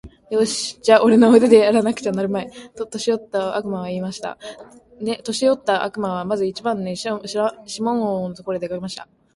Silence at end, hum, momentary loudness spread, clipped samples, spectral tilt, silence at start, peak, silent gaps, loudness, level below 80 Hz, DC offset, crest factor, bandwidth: 0.3 s; none; 17 LU; under 0.1%; -5 dB/octave; 0.05 s; 0 dBFS; none; -19 LUFS; -58 dBFS; under 0.1%; 20 dB; 11.5 kHz